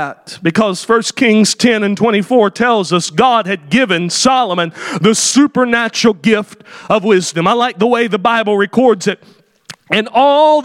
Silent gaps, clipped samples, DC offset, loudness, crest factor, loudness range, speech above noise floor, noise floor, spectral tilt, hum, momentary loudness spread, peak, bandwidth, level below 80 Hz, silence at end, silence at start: none; under 0.1%; under 0.1%; -12 LUFS; 12 dB; 2 LU; 25 dB; -38 dBFS; -4 dB/octave; none; 6 LU; 0 dBFS; 15 kHz; -56 dBFS; 0 s; 0 s